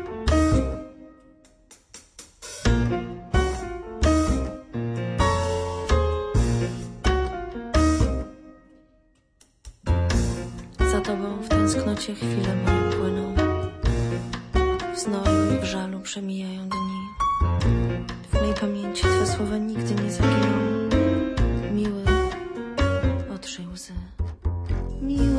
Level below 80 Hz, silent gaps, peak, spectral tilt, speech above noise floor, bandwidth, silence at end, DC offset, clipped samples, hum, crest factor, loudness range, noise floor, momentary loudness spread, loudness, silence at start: -30 dBFS; none; -8 dBFS; -6 dB/octave; 38 dB; 11 kHz; 0 s; under 0.1%; under 0.1%; none; 16 dB; 4 LU; -61 dBFS; 11 LU; -25 LUFS; 0 s